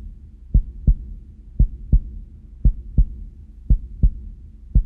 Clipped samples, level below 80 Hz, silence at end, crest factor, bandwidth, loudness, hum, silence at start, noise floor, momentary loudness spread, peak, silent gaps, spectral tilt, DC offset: under 0.1%; -20 dBFS; 0 s; 16 dB; 0.7 kHz; -24 LUFS; none; 0.05 s; -38 dBFS; 20 LU; -4 dBFS; none; -13 dB/octave; under 0.1%